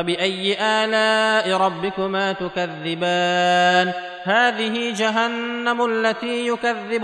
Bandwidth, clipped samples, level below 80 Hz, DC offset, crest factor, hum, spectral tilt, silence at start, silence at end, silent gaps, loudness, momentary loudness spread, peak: 11.5 kHz; under 0.1%; -64 dBFS; under 0.1%; 14 dB; none; -4 dB/octave; 0 s; 0 s; none; -20 LUFS; 7 LU; -6 dBFS